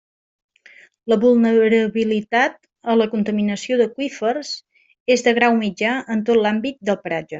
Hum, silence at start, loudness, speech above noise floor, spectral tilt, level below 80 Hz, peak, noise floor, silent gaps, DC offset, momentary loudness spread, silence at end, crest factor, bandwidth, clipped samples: none; 1.05 s; -19 LUFS; 31 dB; -5 dB/octave; -64 dBFS; -2 dBFS; -49 dBFS; 5.00-5.06 s; under 0.1%; 9 LU; 0 s; 16 dB; 7.8 kHz; under 0.1%